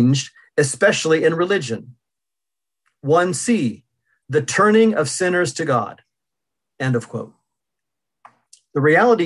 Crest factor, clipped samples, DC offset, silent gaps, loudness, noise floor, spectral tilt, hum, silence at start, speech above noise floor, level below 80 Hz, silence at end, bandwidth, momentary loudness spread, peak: 18 dB; under 0.1%; under 0.1%; none; -18 LUFS; -87 dBFS; -5 dB/octave; none; 0 s; 69 dB; -64 dBFS; 0 s; 12 kHz; 14 LU; -2 dBFS